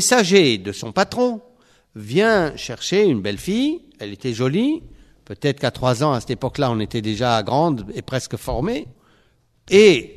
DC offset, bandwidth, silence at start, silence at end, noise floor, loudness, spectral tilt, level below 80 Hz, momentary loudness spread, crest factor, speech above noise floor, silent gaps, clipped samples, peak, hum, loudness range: under 0.1%; 13.5 kHz; 0 s; 0.05 s; -59 dBFS; -19 LUFS; -4.5 dB/octave; -46 dBFS; 13 LU; 20 dB; 41 dB; none; under 0.1%; 0 dBFS; none; 3 LU